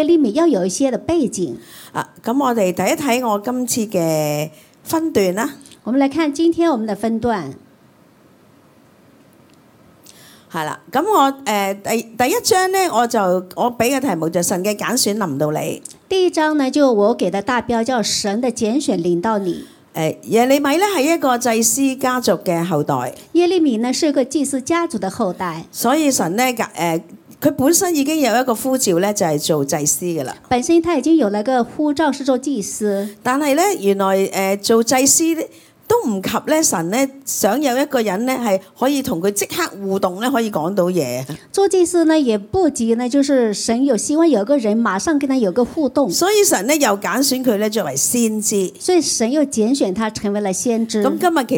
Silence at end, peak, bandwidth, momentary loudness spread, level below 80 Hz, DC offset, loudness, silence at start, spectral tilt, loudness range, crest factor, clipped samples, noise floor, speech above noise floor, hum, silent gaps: 0 s; 0 dBFS; 18 kHz; 7 LU; -56 dBFS; under 0.1%; -17 LUFS; 0 s; -4 dB/octave; 3 LU; 16 dB; under 0.1%; -50 dBFS; 33 dB; none; none